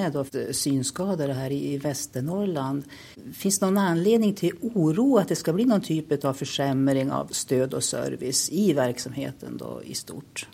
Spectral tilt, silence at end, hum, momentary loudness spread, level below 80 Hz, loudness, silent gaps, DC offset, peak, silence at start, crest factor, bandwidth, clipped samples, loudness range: -5 dB/octave; 0.1 s; none; 12 LU; -62 dBFS; -25 LUFS; none; under 0.1%; -6 dBFS; 0 s; 18 dB; 16.5 kHz; under 0.1%; 4 LU